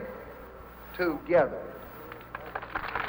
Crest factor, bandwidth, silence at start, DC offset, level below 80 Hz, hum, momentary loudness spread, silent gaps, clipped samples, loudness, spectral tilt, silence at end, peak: 20 dB; 17 kHz; 0 s; under 0.1%; -54 dBFS; none; 20 LU; none; under 0.1%; -30 LUFS; -7.5 dB/octave; 0 s; -14 dBFS